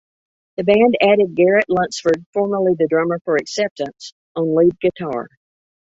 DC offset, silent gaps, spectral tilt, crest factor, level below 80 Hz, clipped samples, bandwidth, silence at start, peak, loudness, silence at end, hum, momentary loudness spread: under 0.1%; 2.26-2.33 s, 3.21-3.25 s, 3.71-3.76 s, 4.12-4.35 s; -5.5 dB/octave; 16 dB; -58 dBFS; under 0.1%; 8 kHz; 0.6 s; -2 dBFS; -17 LUFS; 0.7 s; none; 14 LU